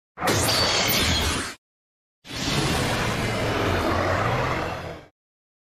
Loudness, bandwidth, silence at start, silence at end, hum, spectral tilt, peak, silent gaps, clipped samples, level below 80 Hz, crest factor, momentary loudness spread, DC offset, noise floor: -23 LUFS; 16 kHz; 0.15 s; 0.65 s; none; -3.5 dB/octave; -8 dBFS; 1.58-2.22 s; under 0.1%; -40 dBFS; 16 dB; 13 LU; under 0.1%; under -90 dBFS